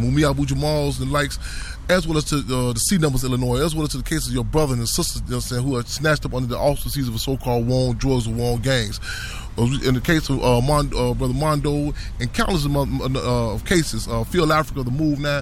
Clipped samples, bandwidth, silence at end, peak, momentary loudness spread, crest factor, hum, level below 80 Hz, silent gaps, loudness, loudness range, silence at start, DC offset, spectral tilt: under 0.1%; 16.5 kHz; 0 s; -6 dBFS; 6 LU; 16 dB; none; -30 dBFS; none; -21 LUFS; 1 LU; 0 s; under 0.1%; -5 dB/octave